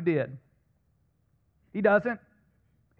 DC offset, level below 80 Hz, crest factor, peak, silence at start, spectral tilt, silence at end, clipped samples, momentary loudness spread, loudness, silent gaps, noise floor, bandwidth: under 0.1%; -68 dBFS; 20 dB; -10 dBFS; 0 s; -9.5 dB/octave; 0.8 s; under 0.1%; 15 LU; -28 LUFS; none; -70 dBFS; 5.4 kHz